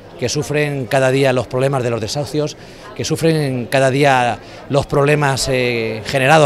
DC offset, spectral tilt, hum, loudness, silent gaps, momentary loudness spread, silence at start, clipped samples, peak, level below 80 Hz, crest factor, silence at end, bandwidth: under 0.1%; -5 dB/octave; none; -16 LUFS; none; 9 LU; 0 s; under 0.1%; 0 dBFS; -42 dBFS; 16 dB; 0 s; 15 kHz